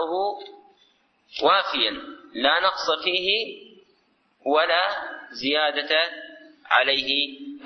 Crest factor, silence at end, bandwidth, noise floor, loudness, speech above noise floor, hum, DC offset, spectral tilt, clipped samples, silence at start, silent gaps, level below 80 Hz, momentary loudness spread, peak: 20 dB; 0 s; 6.4 kHz; -65 dBFS; -22 LUFS; 42 dB; none; under 0.1%; -2.5 dB/octave; under 0.1%; 0 s; none; -64 dBFS; 17 LU; -4 dBFS